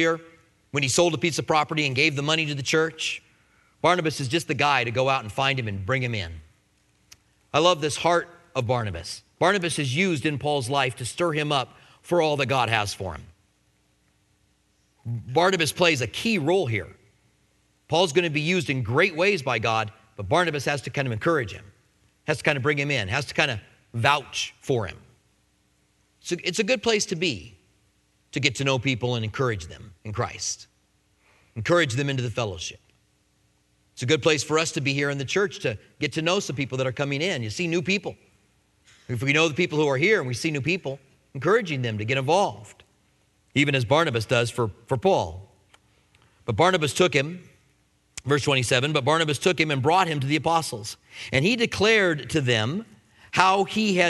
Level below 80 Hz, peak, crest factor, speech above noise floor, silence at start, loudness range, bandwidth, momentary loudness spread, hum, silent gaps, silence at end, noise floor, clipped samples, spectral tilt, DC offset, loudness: -58 dBFS; 0 dBFS; 24 dB; 42 dB; 0 s; 5 LU; 12 kHz; 13 LU; none; none; 0 s; -66 dBFS; under 0.1%; -4.5 dB/octave; under 0.1%; -24 LUFS